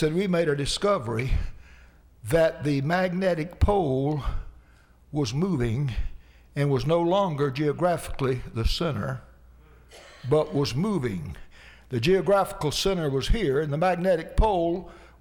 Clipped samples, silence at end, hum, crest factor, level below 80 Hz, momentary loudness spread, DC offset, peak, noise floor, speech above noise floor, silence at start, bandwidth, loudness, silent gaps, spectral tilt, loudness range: under 0.1%; 0.15 s; none; 14 dB; -36 dBFS; 11 LU; under 0.1%; -12 dBFS; -55 dBFS; 31 dB; 0 s; 17.5 kHz; -26 LUFS; none; -6 dB/octave; 4 LU